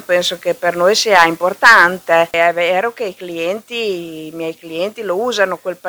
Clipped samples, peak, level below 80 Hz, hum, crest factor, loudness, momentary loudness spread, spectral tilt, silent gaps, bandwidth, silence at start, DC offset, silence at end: 0.2%; 0 dBFS; -58 dBFS; none; 16 dB; -14 LUFS; 16 LU; -2.5 dB/octave; none; over 20 kHz; 0 s; under 0.1%; 0 s